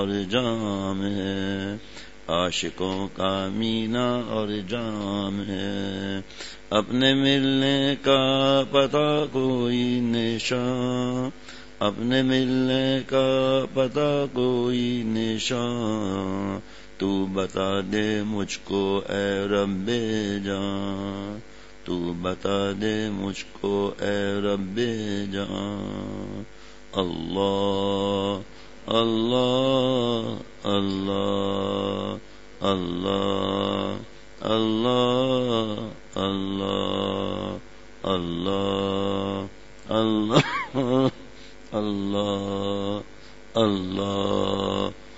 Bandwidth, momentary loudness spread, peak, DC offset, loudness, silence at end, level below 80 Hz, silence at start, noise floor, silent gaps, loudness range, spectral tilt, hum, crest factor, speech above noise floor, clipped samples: 8 kHz; 11 LU; -4 dBFS; 0.6%; -25 LUFS; 0 s; -54 dBFS; 0 s; -46 dBFS; none; 6 LU; -5.5 dB/octave; none; 20 dB; 21 dB; under 0.1%